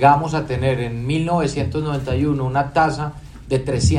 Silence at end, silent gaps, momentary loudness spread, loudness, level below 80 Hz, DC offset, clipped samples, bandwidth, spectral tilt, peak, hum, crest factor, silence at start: 0 s; none; 5 LU; -20 LUFS; -38 dBFS; under 0.1%; under 0.1%; 11 kHz; -6.5 dB/octave; 0 dBFS; none; 18 dB; 0 s